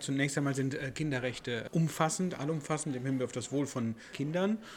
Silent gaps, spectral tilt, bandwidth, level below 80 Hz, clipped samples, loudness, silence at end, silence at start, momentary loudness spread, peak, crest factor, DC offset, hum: none; -5.5 dB/octave; 17 kHz; -66 dBFS; under 0.1%; -34 LUFS; 0 s; 0 s; 5 LU; -12 dBFS; 20 dB; under 0.1%; none